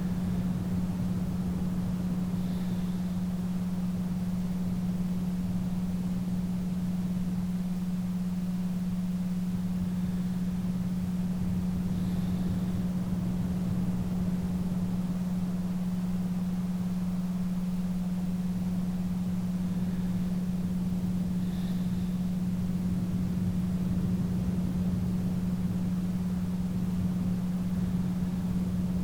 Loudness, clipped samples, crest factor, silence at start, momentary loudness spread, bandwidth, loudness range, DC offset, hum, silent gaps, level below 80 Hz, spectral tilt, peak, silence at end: -31 LUFS; under 0.1%; 12 dB; 0 s; 2 LU; 16.5 kHz; 1 LU; under 0.1%; none; none; -44 dBFS; -8 dB/octave; -18 dBFS; 0 s